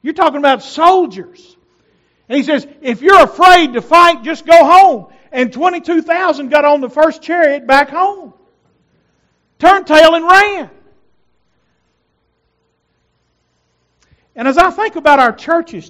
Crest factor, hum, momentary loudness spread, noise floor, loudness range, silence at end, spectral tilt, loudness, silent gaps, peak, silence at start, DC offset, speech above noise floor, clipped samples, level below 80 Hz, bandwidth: 12 dB; 60 Hz at -60 dBFS; 12 LU; -63 dBFS; 7 LU; 0.1 s; -3.5 dB/octave; -10 LUFS; none; 0 dBFS; 0.05 s; under 0.1%; 53 dB; 2%; -46 dBFS; 16.5 kHz